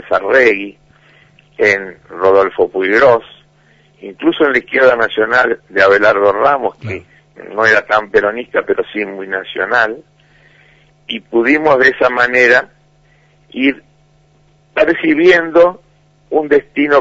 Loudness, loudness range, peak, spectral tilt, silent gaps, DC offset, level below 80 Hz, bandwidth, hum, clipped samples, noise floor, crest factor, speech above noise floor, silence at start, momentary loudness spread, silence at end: -12 LUFS; 3 LU; 0 dBFS; -5 dB/octave; none; under 0.1%; -52 dBFS; 7.8 kHz; none; under 0.1%; -51 dBFS; 14 dB; 39 dB; 0.05 s; 13 LU; 0 s